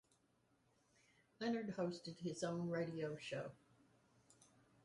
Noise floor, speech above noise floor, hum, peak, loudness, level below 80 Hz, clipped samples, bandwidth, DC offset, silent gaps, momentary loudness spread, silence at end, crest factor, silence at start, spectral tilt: -79 dBFS; 35 dB; none; -30 dBFS; -45 LUFS; -82 dBFS; under 0.1%; 11.5 kHz; under 0.1%; none; 6 LU; 1.3 s; 18 dB; 1.4 s; -6 dB/octave